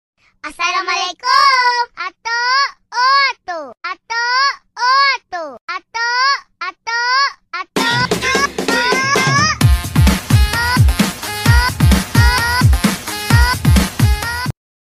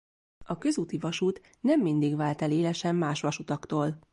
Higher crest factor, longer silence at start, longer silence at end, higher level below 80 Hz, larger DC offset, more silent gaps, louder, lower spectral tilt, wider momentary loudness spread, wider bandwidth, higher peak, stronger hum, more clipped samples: about the same, 14 dB vs 14 dB; about the same, 0.45 s vs 0.4 s; first, 0.35 s vs 0.15 s; first, -22 dBFS vs -64 dBFS; neither; first, 5.61-5.68 s vs none; first, -14 LUFS vs -29 LUFS; second, -4 dB/octave vs -6 dB/octave; first, 13 LU vs 6 LU; first, 16 kHz vs 11 kHz; first, 0 dBFS vs -14 dBFS; neither; neither